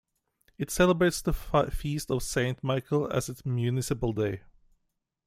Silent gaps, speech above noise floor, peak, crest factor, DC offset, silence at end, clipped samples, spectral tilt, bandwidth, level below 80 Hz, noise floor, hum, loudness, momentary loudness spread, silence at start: none; 51 dB; -8 dBFS; 20 dB; under 0.1%; 0.9 s; under 0.1%; -5.5 dB/octave; 16 kHz; -44 dBFS; -79 dBFS; none; -29 LUFS; 8 LU; 0.6 s